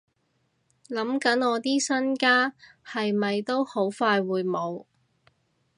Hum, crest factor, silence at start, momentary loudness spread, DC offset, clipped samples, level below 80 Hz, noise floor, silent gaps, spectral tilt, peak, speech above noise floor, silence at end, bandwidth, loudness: none; 20 dB; 0.9 s; 10 LU; under 0.1%; under 0.1%; -80 dBFS; -72 dBFS; none; -4 dB/octave; -8 dBFS; 47 dB; 0.95 s; 11 kHz; -25 LUFS